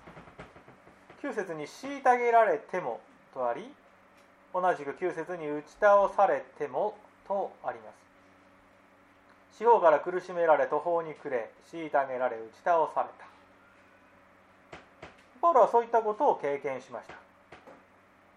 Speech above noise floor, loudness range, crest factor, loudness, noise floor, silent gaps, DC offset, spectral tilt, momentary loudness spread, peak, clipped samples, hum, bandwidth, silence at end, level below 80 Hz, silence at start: 32 dB; 5 LU; 22 dB; -28 LUFS; -60 dBFS; none; under 0.1%; -5.5 dB/octave; 18 LU; -8 dBFS; under 0.1%; none; 11 kHz; 0.65 s; -72 dBFS; 0.05 s